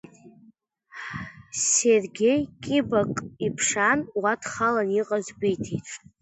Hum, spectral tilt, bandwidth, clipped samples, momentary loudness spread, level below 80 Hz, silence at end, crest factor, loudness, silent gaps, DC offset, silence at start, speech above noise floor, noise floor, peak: none; -3.5 dB/octave; 8.4 kHz; under 0.1%; 15 LU; -58 dBFS; 0.25 s; 18 dB; -24 LUFS; none; under 0.1%; 0.25 s; 34 dB; -58 dBFS; -8 dBFS